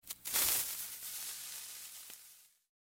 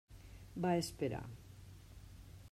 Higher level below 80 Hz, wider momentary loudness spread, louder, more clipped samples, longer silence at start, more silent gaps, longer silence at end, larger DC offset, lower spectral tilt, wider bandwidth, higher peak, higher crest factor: second, -72 dBFS vs -60 dBFS; about the same, 20 LU vs 21 LU; first, -36 LUFS vs -40 LUFS; neither; about the same, 0.05 s vs 0.1 s; neither; first, 0.45 s vs 0.05 s; neither; second, 1.5 dB/octave vs -6 dB/octave; about the same, 17 kHz vs 16 kHz; first, -12 dBFS vs -22 dBFS; first, 28 dB vs 20 dB